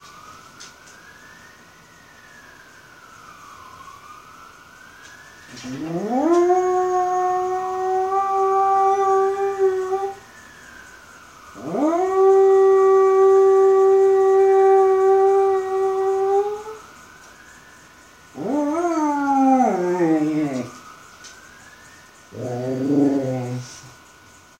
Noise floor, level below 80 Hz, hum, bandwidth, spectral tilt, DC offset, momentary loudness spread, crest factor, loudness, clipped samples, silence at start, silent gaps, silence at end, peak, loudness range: -48 dBFS; -62 dBFS; none; 9 kHz; -6.5 dB/octave; under 0.1%; 19 LU; 14 dB; -18 LUFS; under 0.1%; 0.3 s; none; 0.7 s; -6 dBFS; 11 LU